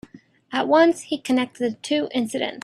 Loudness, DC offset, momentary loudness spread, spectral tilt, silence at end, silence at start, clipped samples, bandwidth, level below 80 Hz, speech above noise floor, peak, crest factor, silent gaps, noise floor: -22 LUFS; under 0.1%; 10 LU; -4 dB/octave; 0.05 s; 0.15 s; under 0.1%; 13 kHz; -66 dBFS; 25 dB; -4 dBFS; 18 dB; none; -46 dBFS